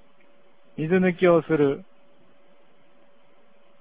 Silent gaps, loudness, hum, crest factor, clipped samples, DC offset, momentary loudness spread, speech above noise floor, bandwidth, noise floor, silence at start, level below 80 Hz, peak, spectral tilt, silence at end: none; -22 LUFS; none; 20 dB; under 0.1%; 0.4%; 15 LU; 39 dB; 4 kHz; -60 dBFS; 0.8 s; -64 dBFS; -6 dBFS; -11.5 dB/octave; 2 s